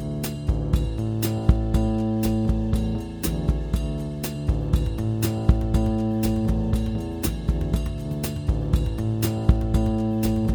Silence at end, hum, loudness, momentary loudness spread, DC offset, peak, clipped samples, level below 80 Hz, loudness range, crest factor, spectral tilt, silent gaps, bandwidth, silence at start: 0 s; none; -25 LUFS; 6 LU; under 0.1%; -4 dBFS; under 0.1%; -26 dBFS; 1 LU; 20 dB; -7 dB/octave; none; over 20 kHz; 0 s